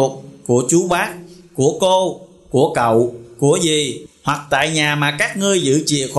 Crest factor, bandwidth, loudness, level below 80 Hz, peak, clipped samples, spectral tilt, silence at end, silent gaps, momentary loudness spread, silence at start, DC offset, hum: 14 dB; 12.5 kHz; -17 LUFS; -52 dBFS; -4 dBFS; under 0.1%; -4 dB/octave; 0 s; none; 9 LU; 0 s; under 0.1%; none